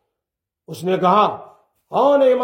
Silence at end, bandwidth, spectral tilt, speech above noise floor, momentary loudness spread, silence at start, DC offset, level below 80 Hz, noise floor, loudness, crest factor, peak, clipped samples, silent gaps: 0 s; 16.5 kHz; -6.5 dB/octave; 68 dB; 18 LU; 0.7 s; under 0.1%; -70 dBFS; -84 dBFS; -17 LUFS; 16 dB; -2 dBFS; under 0.1%; none